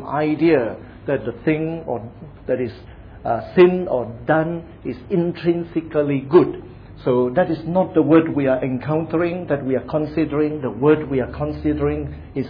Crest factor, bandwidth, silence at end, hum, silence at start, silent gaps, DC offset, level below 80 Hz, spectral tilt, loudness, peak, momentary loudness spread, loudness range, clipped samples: 18 dB; 5.2 kHz; 0 s; none; 0 s; none; under 0.1%; -44 dBFS; -11 dB/octave; -20 LUFS; 0 dBFS; 13 LU; 3 LU; under 0.1%